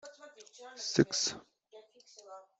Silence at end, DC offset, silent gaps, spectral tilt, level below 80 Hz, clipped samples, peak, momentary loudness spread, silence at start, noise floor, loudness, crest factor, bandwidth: 0.2 s; under 0.1%; none; -3.5 dB/octave; -74 dBFS; under 0.1%; -10 dBFS; 24 LU; 0.05 s; -59 dBFS; -32 LUFS; 28 dB; 8.2 kHz